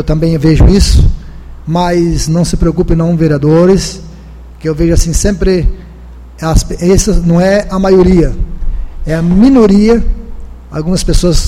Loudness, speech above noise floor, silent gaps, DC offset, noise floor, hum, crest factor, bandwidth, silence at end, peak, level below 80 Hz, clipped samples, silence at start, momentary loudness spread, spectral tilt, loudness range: -10 LUFS; 22 dB; none; under 0.1%; -30 dBFS; none; 8 dB; 15 kHz; 0 s; 0 dBFS; -14 dBFS; 0.5%; 0 s; 15 LU; -6 dB/octave; 3 LU